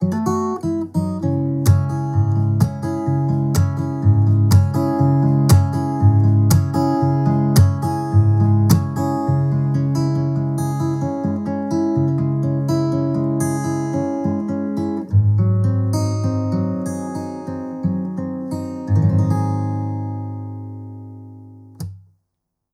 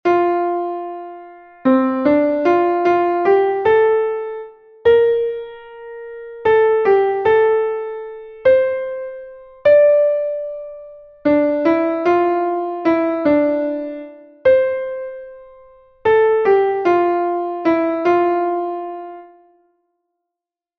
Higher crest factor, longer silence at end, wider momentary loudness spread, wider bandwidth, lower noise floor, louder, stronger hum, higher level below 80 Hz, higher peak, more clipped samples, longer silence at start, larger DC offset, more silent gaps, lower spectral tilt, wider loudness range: about the same, 16 dB vs 14 dB; second, 0.75 s vs 1.55 s; second, 12 LU vs 18 LU; first, 15 kHz vs 6.2 kHz; second, -77 dBFS vs -85 dBFS; second, -19 LUFS vs -16 LUFS; neither; first, -44 dBFS vs -56 dBFS; about the same, -2 dBFS vs -2 dBFS; neither; about the same, 0 s vs 0.05 s; neither; neither; about the same, -8 dB/octave vs -7.5 dB/octave; first, 7 LU vs 3 LU